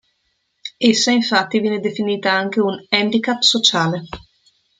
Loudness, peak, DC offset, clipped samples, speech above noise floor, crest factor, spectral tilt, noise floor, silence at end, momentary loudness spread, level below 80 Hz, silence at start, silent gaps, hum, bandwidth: -17 LUFS; 0 dBFS; under 0.1%; under 0.1%; 51 dB; 18 dB; -3.5 dB/octave; -68 dBFS; 0.6 s; 15 LU; -56 dBFS; 0.65 s; none; none; 9.4 kHz